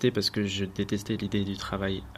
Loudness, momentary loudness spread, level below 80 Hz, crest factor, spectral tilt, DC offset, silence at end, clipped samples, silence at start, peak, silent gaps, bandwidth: -30 LUFS; 4 LU; -50 dBFS; 18 dB; -5 dB/octave; under 0.1%; 0 s; under 0.1%; 0 s; -12 dBFS; none; 15 kHz